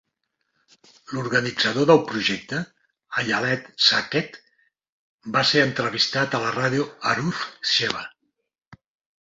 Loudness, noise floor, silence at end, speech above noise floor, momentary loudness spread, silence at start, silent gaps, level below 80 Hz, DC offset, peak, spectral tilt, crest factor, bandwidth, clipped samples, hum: -22 LUFS; -77 dBFS; 0.45 s; 54 dB; 13 LU; 1.1 s; 4.89-5.18 s, 8.67-8.71 s; -62 dBFS; under 0.1%; -2 dBFS; -4 dB/octave; 22 dB; 7.8 kHz; under 0.1%; none